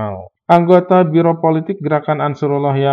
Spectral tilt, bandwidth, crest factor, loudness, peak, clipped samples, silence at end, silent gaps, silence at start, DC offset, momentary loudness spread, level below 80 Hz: -9.5 dB/octave; 6.6 kHz; 14 dB; -14 LUFS; 0 dBFS; 0.3%; 0 s; none; 0 s; under 0.1%; 8 LU; -64 dBFS